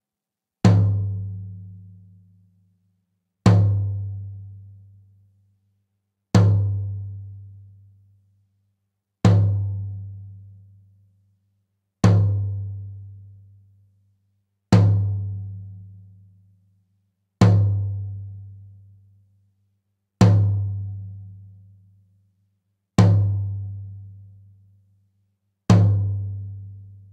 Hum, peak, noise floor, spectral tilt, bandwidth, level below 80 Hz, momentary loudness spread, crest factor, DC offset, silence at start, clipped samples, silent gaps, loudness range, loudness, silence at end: none; -2 dBFS; -87 dBFS; -8 dB/octave; 8.4 kHz; -48 dBFS; 24 LU; 20 dB; under 0.1%; 0.65 s; under 0.1%; none; 2 LU; -21 LUFS; 0.25 s